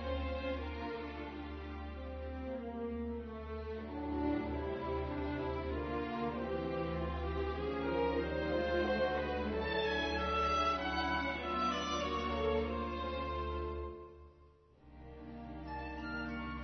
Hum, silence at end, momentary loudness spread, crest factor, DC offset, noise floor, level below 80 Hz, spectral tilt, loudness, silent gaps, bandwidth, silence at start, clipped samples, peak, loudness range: none; 0 s; 11 LU; 14 dB; under 0.1%; -63 dBFS; -48 dBFS; -4 dB/octave; -38 LUFS; none; 6.2 kHz; 0 s; under 0.1%; -24 dBFS; 9 LU